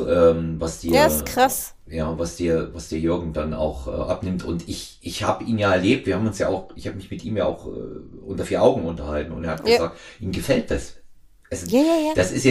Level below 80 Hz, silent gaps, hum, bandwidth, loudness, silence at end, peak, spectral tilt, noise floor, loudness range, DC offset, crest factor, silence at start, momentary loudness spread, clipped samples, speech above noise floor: -40 dBFS; none; none; 15.5 kHz; -22 LUFS; 0 s; -4 dBFS; -5 dB/octave; -46 dBFS; 3 LU; under 0.1%; 18 dB; 0 s; 14 LU; under 0.1%; 24 dB